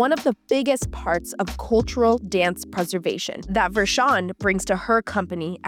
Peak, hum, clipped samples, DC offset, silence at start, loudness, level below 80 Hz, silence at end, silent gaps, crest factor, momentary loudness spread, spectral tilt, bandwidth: -8 dBFS; none; under 0.1%; under 0.1%; 0 s; -22 LUFS; -40 dBFS; 0 s; none; 14 dB; 7 LU; -4.5 dB/octave; 18 kHz